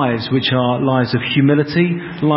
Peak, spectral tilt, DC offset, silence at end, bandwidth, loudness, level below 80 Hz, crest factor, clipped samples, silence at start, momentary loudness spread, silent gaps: -2 dBFS; -11.5 dB/octave; under 0.1%; 0 s; 5.8 kHz; -16 LUFS; -50 dBFS; 14 dB; under 0.1%; 0 s; 3 LU; none